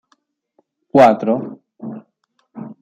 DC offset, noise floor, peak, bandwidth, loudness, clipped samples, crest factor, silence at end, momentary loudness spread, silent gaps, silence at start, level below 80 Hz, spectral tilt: under 0.1%; -66 dBFS; -2 dBFS; 10.5 kHz; -14 LUFS; under 0.1%; 18 dB; 0.1 s; 24 LU; none; 0.95 s; -62 dBFS; -7 dB/octave